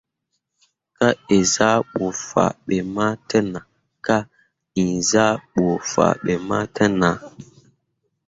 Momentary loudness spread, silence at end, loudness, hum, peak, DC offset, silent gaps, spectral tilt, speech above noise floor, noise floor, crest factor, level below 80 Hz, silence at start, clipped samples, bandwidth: 8 LU; 0.85 s; -20 LUFS; none; -2 dBFS; under 0.1%; none; -4.5 dB/octave; 56 dB; -76 dBFS; 20 dB; -52 dBFS; 1 s; under 0.1%; 8 kHz